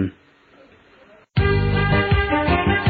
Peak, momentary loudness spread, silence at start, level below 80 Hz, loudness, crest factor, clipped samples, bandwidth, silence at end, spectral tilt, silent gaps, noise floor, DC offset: -6 dBFS; 6 LU; 0 s; -30 dBFS; -19 LUFS; 14 dB; under 0.1%; 4.9 kHz; 0 s; -10 dB/octave; none; -52 dBFS; under 0.1%